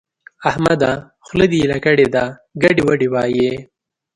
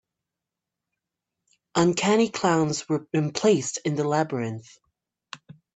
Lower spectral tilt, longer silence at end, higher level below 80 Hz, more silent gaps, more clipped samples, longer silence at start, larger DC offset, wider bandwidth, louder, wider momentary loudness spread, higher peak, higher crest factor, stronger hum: first, -6.5 dB/octave vs -5 dB/octave; first, 0.55 s vs 0.25 s; first, -44 dBFS vs -66 dBFS; neither; neither; second, 0.4 s vs 1.75 s; neither; first, 11.5 kHz vs 9.2 kHz; first, -16 LUFS vs -24 LUFS; second, 9 LU vs 20 LU; first, 0 dBFS vs -6 dBFS; about the same, 16 dB vs 20 dB; neither